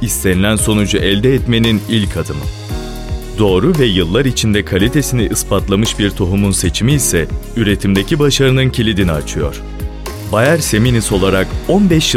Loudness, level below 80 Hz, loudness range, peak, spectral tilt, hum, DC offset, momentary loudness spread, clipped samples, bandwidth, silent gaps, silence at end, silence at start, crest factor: -13 LUFS; -24 dBFS; 1 LU; 0 dBFS; -5 dB/octave; none; under 0.1%; 11 LU; under 0.1%; 16.5 kHz; none; 0 s; 0 s; 12 dB